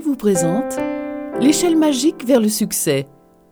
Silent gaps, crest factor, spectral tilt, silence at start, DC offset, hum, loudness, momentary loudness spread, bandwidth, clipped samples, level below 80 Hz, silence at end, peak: none; 16 dB; -4.5 dB/octave; 0 s; under 0.1%; none; -17 LUFS; 9 LU; over 20 kHz; under 0.1%; -54 dBFS; 0.45 s; -2 dBFS